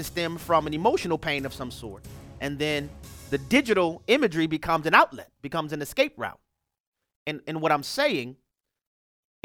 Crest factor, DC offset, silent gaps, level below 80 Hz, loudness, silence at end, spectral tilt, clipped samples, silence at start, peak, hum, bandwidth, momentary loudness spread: 24 dB; under 0.1%; 6.80-6.92 s, 7.16-7.26 s; -52 dBFS; -25 LUFS; 1.1 s; -4.5 dB/octave; under 0.1%; 0 s; -2 dBFS; none; 18 kHz; 17 LU